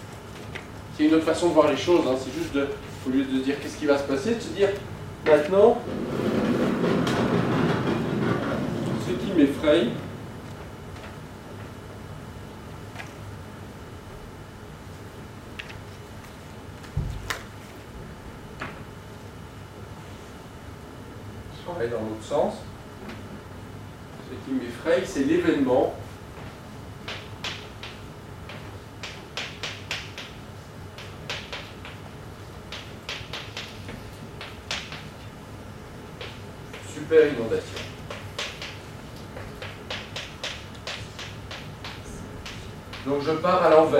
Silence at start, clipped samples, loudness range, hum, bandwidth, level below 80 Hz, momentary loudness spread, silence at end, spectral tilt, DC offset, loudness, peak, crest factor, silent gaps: 0 s; under 0.1%; 17 LU; none; 16 kHz; -48 dBFS; 20 LU; 0 s; -6 dB/octave; under 0.1%; -26 LUFS; -2 dBFS; 24 dB; none